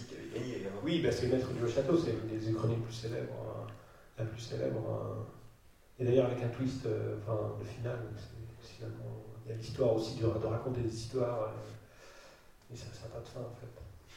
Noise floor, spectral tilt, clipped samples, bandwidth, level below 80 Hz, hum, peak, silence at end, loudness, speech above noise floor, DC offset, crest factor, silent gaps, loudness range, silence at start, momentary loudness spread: -60 dBFS; -7 dB/octave; under 0.1%; 14 kHz; -58 dBFS; none; -14 dBFS; 0 s; -36 LUFS; 25 dB; under 0.1%; 22 dB; none; 6 LU; 0 s; 18 LU